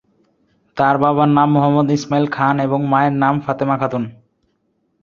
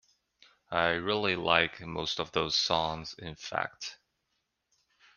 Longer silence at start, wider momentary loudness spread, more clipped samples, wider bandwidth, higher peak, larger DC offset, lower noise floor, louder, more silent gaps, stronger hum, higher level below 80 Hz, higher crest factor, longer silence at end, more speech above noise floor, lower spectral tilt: about the same, 0.75 s vs 0.7 s; second, 7 LU vs 15 LU; neither; second, 7.2 kHz vs 10 kHz; first, 0 dBFS vs -4 dBFS; neither; second, -66 dBFS vs -81 dBFS; first, -16 LUFS vs -30 LUFS; neither; neither; first, -56 dBFS vs -62 dBFS; second, 16 dB vs 28 dB; second, 0.9 s vs 1.25 s; about the same, 50 dB vs 50 dB; first, -7.5 dB/octave vs -3.5 dB/octave